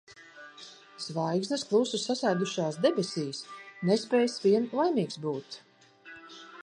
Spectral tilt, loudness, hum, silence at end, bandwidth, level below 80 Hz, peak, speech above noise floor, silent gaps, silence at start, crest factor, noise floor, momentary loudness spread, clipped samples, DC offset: -5 dB/octave; -29 LUFS; none; 0.05 s; 10.5 kHz; -80 dBFS; -12 dBFS; 24 dB; none; 0.1 s; 18 dB; -52 dBFS; 21 LU; under 0.1%; under 0.1%